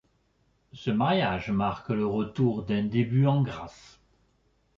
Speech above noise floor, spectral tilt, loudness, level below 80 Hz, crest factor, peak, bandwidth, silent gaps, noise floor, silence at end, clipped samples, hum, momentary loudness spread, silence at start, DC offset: 42 dB; -8.5 dB/octave; -27 LUFS; -56 dBFS; 16 dB; -12 dBFS; 7.4 kHz; none; -69 dBFS; 1.1 s; under 0.1%; none; 8 LU; 0.75 s; under 0.1%